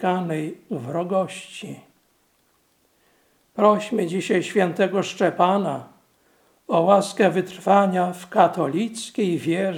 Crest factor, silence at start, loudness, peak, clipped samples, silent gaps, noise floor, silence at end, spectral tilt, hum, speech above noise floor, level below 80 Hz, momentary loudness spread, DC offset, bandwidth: 22 dB; 0 s; -21 LUFS; 0 dBFS; under 0.1%; none; -64 dBFS; 0 s; -6 dB/octave; none; 43 dB; -74 dBFS; 14 LU; under 0.1%; 16.5 kHz